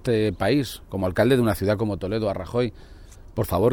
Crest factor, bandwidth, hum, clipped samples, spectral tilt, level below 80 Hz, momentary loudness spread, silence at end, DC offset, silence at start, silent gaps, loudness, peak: 16 dB; 18 kHz; none; under 0.1%; -6.5 dB/octave; -44 dBFS; 10 LU; 0 s; under 0.1%; 0 s; none; -24 LUFS; -6 dBFS